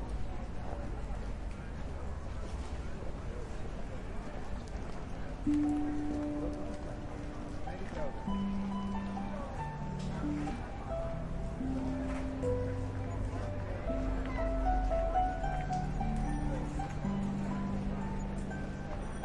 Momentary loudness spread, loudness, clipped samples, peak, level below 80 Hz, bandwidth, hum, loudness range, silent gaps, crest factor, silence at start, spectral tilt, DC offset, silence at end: 10 LU; -38 LUFS; under 0.1%; -18 dBFS; -40 dBFS; 11 kHz; none; 8 LU; none; 18 dB; 0 s; -7.5 dB/octave; under 0.1%; 0 s